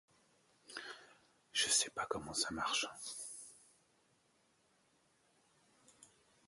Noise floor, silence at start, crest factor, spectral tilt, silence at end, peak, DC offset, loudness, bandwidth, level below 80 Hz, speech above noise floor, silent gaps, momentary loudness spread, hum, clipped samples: -75 dBFS; 0.7 s; 24 dB; 0 dB/octave; 0.4 s; -20 dBFS; under 0.1%; -37 LUFS; 12 kHz; -74 dBFS; 35 dB; none; 20 LU; none; under 0.1%